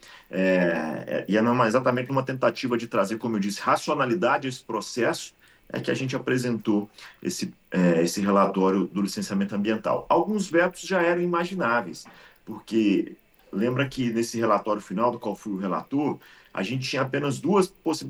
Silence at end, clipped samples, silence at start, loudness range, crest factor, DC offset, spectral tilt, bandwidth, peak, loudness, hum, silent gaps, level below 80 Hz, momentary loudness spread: 0 s; under 0.1%; 0.1 s; 3 LU; 18 dB; under 0.1%; -5.5 dB/octave; 15.5 kHz; -8 dBFS; -25 LUFS; none; none; -64 dBFS; 10 LU